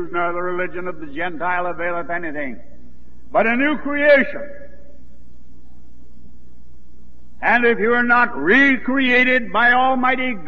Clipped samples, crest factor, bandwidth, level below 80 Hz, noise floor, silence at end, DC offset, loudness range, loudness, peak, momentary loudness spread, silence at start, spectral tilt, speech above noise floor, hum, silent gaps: under 0.1%; 16 dB; 6.8 kHz; -48 dBFS; -48 dBFS; 0 s; 5%; 9 LU; -17 LUFS; -2 dBFS; 13 LU; 0 s; -6 dB/octave; 30 dB; none; none